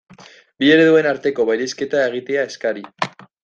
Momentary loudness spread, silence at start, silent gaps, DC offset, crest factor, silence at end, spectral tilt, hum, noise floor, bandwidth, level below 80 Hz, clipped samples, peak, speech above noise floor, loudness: 13 LU; 0.6 s; none; under 0.1%; 16 dB; 0.35 s; -5 dB/octave; none; -45 dBFS; 7.6 kHz; -62 dBFS; under 0.1%; -2 dBFS; 28 dB; -18 LUFS